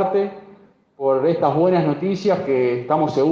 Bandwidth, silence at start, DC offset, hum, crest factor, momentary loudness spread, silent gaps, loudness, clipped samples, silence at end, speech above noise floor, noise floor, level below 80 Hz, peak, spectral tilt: 7.2 kHz; 0 s; under 0.1%; none; 16 dB; 5 LU; none; -19 LUFS; under 0.1%; 0 s; 31 dB; -49 dBFS; -62 dBFS; -4 dBFS; -8 dB/octave